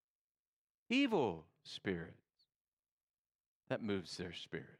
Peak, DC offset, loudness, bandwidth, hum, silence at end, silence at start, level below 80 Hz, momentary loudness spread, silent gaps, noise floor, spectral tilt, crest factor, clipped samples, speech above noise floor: -22 dBFS; under 0.1%; -40 LUFS; 11.5 kHz; none; 0.05 s; 0.9 s; -80 dBFS; 15 LU; 2.56-2.83 s, 2.91-2.97 s, 3.03-3.61 s; under -90 dBFS; -5.5 dB/octave; 20 dB; under 0.1%; over 50 dB